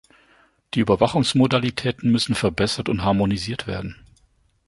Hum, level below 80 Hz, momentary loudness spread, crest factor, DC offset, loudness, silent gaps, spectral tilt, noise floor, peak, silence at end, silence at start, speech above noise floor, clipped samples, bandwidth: none; -44 dBFS; 10 LU; 20 dB; under 0.1%; -21 LUFS; none; -5.5 dB/octave; -61 dBFS; -2 dBFS; 0.75 s; 0.75 s; 41 dB; under 0.1%; 11.5 kHz